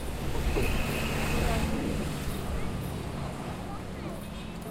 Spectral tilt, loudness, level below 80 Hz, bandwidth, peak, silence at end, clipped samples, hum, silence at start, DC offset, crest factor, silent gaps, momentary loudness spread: -5.5 dB/octave; -33 LUFS; -36 dBFS; 16 kHz; -14 dBFS; 0 s; under 0.1%; none; 0 s; under 0.1%; 16 dB; none; 9 LU